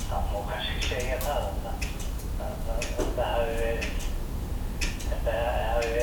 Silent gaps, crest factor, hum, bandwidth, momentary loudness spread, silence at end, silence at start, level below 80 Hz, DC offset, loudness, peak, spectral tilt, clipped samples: none; 14 dB; none; 19.5 kHz; 7 LU; 0 s; 0 s; -32 dBFS; under 0.1%; -31 LUFS; -14 dBFS; -4.5 dB/octave; under 0.1%